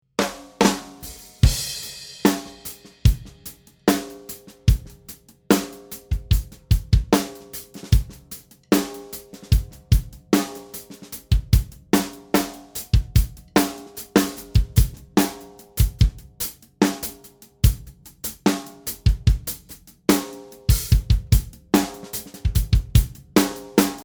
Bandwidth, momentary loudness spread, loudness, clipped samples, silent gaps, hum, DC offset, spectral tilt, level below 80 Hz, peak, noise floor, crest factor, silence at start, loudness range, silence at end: over 20 kHz; 16 LU; -23 LUFS; under 0.1%; none; none; under 0.1%; -5.5 dB/octave; -26 dBFS; 0 dBFS; -48 dBFS; 22 dB; 0.2 s; 3 LU; 0 s